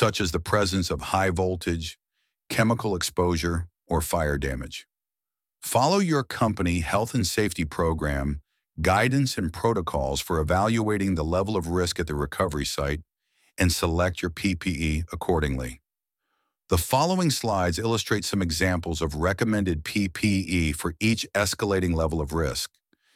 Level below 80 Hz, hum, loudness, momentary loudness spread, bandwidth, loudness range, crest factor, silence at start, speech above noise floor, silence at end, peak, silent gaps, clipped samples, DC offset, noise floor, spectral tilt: -38 dBFS; none; -25 LUFS; 7 LU; 16.5 kHz; 2 LU; 20 dB; 0 s; over 65 dB; 0.5 s; -6 dBFS; none; under 0.1%; under 0.1%; under -90 dBFS; -5 dB/octave